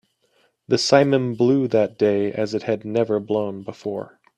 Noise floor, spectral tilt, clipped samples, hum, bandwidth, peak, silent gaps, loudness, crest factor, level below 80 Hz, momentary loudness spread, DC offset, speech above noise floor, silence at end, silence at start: -64 dBFS; -5.5 dB/octave; under 0.1%; none; 10 kHz; 0 dBFS; none; -21 LUFS; 20 dB; -64 dBFS; 13 LU; under 0.1%; 44 dB; 0.3 s; 0.7 s